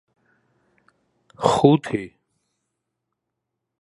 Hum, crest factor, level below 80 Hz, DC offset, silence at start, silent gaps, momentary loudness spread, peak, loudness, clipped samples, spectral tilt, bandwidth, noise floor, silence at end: none; 24 dB; -60 dBFS; under 0.1%; 1.4 s; none; 14 LU; 0 dBFS; -20 LUFS; under 0.1%; -6.5 dB/octave; 11.5 kHz; -81 dBFS; 1.75 s